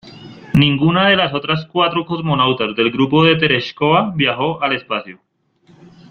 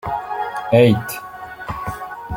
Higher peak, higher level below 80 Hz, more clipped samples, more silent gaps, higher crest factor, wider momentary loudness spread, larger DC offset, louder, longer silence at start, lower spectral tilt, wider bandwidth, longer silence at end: about the same, -2 dBFS vs -2 dBFS; about the same, -48 dBFS vs -44 dBFS; neither; neither; about the same, 16 dB vs 18 dB; second, 7 LU vs 17 LU; neither; first, -15 LUFS vs -19 LUFS; about the same, 0.05 s vs 0.05 s; about the same, -7.5 dB/octave vs -6.5 dB/octave; second, 6.6 kHz vs 17 kHz; first, 1 s vs 0 s